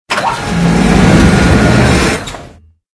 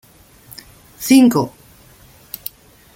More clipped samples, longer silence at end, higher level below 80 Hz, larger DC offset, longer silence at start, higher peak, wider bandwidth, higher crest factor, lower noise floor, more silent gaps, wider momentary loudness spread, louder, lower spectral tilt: first, 0.7% vs under 0.1%; second, 0.45 s vs 1.45 s; first, -20 dBFS vs -54 dBFS; neither; second, 0.1 s vs 1 s; about the same, 0 dBFS vs 0 dBFS; second, 11 kHz vs 17 kHz; second, 10 dB vs 18 dB; second, -37 dBFS vs -46 dBFS; neither; second, 10 LU vs 27 LU; first, -9 LUFS vs -14 LUFS; about the same, -5.5 dB/octave vs -4.5 dB/octave